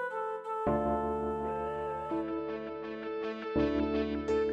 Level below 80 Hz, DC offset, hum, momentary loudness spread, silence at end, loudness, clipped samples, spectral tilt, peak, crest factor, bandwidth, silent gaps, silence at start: -50 dBFS; under 0.1%; none; 8 LU; 0 s; -34 LUFS; under 0.1%; -7.5 dB/octave; -18 dBFS; 14 dB; 8.4 kHz; none; 0 s